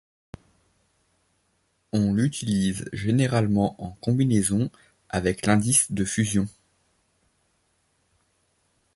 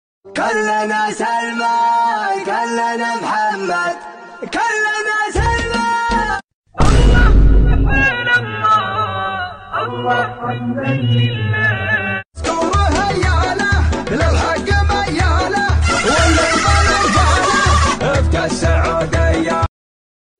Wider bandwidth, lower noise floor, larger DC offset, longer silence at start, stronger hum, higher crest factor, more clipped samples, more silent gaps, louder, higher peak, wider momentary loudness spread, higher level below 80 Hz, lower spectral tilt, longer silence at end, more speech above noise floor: first, 12 kHz vs 10 kHz; second, -70 dBFS vs under -90 dBFS; neither; first, 1.95 s vs 0.25 s; neither; first, 20 dB vs 12 dB; neither; second, none vs 6.54-6.62 s; second, -24 LUFS vs -15 LUFS; second, -6 dBFS vs -2 dBFS; about the same, 9 LU vs 9 LU; second, -50 dBFS vs -20 dBFS; about the same, -5 dB/octave vs -5 dB/octave; first, 2.45 s vs 0.7 s; second, 47 dB vs over 74 dB